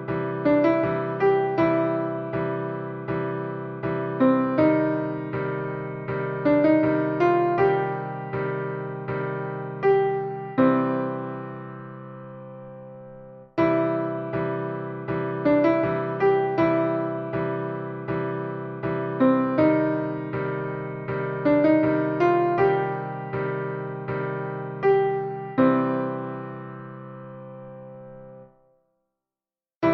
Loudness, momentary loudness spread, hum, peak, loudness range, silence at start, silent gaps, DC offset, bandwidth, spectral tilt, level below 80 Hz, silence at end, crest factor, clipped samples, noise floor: -24 LUFS; 18 LU; none; -8 dBFS; 5 LU; 0 s; 29.76-29.81 s; under 0.1%; 5.8 kHz; -10 dB/octave; -60 dBFS; 0 s; 18 dB; under 0.1%; under -90 dBFS